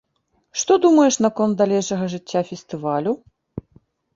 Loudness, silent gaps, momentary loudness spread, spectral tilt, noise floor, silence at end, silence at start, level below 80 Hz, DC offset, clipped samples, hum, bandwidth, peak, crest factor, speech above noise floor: -20 LUFS; none; 21 LU; -5 dB/octave; -68 dBFS; 0.55 s; 0.55 s; -58 dBFS; under 0.1%; under 0.1%; none; 7.8 kHz; -4 dBFS; 16 dB; 49 dB